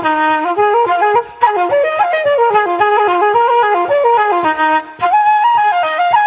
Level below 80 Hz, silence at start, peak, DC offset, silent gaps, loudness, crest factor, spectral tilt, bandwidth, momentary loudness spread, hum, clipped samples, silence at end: -58 dBFS; 0 s; 0 dBFS; under 0.1%; none; -12 LUFS; 12 dB; -7 dB/octave; 4 kHz; 3 LU; none; under 0.1%; 0 s